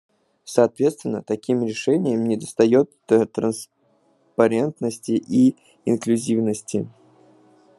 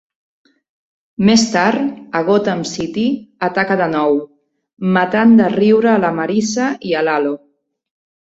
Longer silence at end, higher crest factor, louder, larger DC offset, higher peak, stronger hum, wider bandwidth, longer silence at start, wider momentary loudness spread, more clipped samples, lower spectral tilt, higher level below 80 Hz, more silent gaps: about the same, 0.9 s vs 0.9 s; first, 20 dB vs 14 dB; second, -21 LUFS vs -15 LUFS; neither; about the same, -2 dBFS vs -2 dBFS; neither; first, 12.5 kHz vs 8 kHz; second, 0.45 s vs 1.2 s; about the same, 10 LU vs 10 LU; neither; about the same, -6 dB/octave vs -5 dB/octave; second, -68 dBFS vs -54 dBFS; second, none vs 4.73-4.77 s